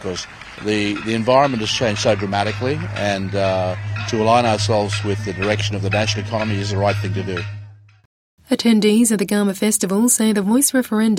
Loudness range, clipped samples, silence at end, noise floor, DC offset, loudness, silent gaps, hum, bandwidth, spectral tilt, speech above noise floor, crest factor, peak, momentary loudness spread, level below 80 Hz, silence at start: 4 LU; under 0.1%; 0 s; -39 dBFS; under 0.1%; -18 LUFS; 8.05-8.38 s; none; 16.5 kHz; -4.5 dB/octave; 21 dB; 16 dB; -2 dBFS; 9 LU; -48 dBFS; 0 s